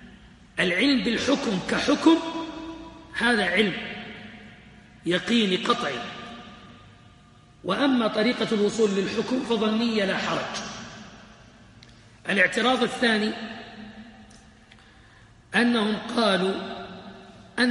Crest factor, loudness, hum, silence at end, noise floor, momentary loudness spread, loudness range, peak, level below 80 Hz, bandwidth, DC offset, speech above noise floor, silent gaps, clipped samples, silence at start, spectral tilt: 20 dB; -24 LUFS; none; 0 s; -53 dBFS; 20 LU; 4 LU; -6 dBFS; -58 dBFS; 11.5 kHz; under 0.1%; 30 dB; none; under 0.1%; 0 s; -4.5 dB/octave